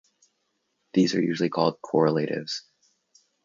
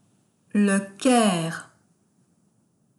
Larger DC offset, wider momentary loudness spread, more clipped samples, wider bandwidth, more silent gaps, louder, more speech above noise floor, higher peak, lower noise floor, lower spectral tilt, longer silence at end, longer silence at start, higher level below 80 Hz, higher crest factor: neither; about the same, 9 LU vs 11 LU; neither; second, 7.6 kHz vs 12 kHz; neither; second, -25 LUFS vs -22 LUFS; first, 51 dB vs 44 dB; about the same, -8 dBFS vs -6 dBFS; first, -75 dBFS vs -66 dBFS; about the same, -6 dB/octave vs -5 dB/octave; second, 0.85 s vs 1.35 s; first, 0.95 s vs 0.55 s; about the same, -70 dBFS vs -72 dBFS; about the same, 20 dB vs 18 dB